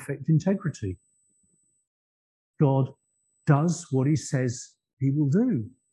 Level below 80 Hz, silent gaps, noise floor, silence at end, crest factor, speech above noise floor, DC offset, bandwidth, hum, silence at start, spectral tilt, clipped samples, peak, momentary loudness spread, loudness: -58 dBFS; 1.87-2.54 s, 4.93-4.97 s; -69 dBFS; 0.25 s; 20 dB; 44 dB; under 0.1%; 11.5 kHz; none; 0 s; -7.5 dB/octave; under 0.1%; -6 dBFS; 12 LU; -26 LUFS